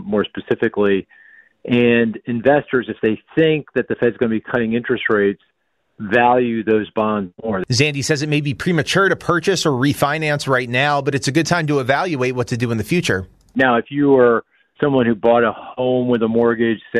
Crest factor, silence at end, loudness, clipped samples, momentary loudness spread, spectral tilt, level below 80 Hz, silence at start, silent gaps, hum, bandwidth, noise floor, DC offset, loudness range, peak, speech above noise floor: 16 dB; 0 s; -17 LUFS; under 0.1%; 6 LU; -5.5 dB/octave; -52 dBFS; 0 s; none; none; 14.5 kHz; -68 dBFS; under 0.1%; 2 LU; -2 dBFS; 51 dB